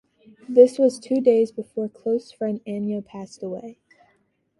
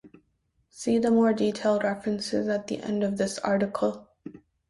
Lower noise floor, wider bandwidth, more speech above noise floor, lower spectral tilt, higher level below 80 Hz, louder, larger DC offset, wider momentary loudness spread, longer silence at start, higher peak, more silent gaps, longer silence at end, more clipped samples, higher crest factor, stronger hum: second, -67 dBFS vs -72 dBFS; about the same, 11.5 kHz vs 11.5 kHz; about the same, 46 dB vs 46 dB; first, -7 dB/octave vs -5.5 dB/octave; second, -72 dBFS vs -64 dBFS; first, -21 LUFS vs -26 LUFS; neither; first, 18 LU vs 14 LU; first, 0.5 s vs 0.05 s; first, -2 dBFS vs -10 dBFS; neither; first, 0.85 s vs 0.3 s; neither; about the same, 20 dB vs 16 dB; neither